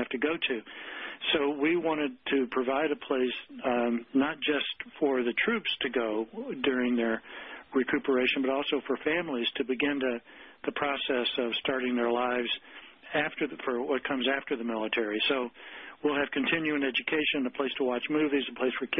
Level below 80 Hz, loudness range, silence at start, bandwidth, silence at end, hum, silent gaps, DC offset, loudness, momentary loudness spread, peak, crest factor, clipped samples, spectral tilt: -66 dBFS; 1 LU; 0 s; 5.6 kHz; 0 s; none; none; under 0.1%; -29 LUFS; 7 LU; -16 dBFS; 14 dB; under 0.1%; -8 dB/octave